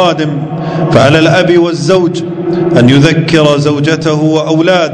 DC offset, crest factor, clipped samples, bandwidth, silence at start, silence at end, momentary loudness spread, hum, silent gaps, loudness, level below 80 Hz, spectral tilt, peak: under 0.1%; 8 dB; 3%; 11 kHz; 0 s; 0 s; 8 LU; none; none; -9 LUFS; -40 dBFS; -6 dB/octave; 0 dBFS